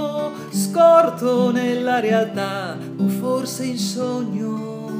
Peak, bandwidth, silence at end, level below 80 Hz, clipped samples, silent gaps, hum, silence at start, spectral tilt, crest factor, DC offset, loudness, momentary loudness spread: -2 dBFS; 15.5 kHz; 0 s; -72 dBFS; under 0.1%; none; none; 0 s; -5.5 dB/octave; 18 dB; under 0.1%; -20 LUFS; 12 LU